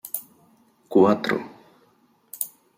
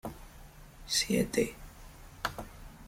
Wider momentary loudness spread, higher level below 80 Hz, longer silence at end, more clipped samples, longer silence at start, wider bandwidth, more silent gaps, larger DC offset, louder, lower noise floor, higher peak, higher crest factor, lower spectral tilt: second, 20 LU vs 24 LU; second, -72 dBFS vs -52 dBFS; first, 0.3 s vs 0 s; neither; about the same, 0.05 s vs 0.05 s; about the same, 16.5 kHz vs 16.5 kHz; neither; neither; first, -23 LUFS vs -32 LUFS; first, -62 dBFS vs -52 dBFS; first, -4 dBFS vs -16 dBFS; about the same, 22 dB vs 20 dB; first, -5 dB/octave vs -3.5 dB/octave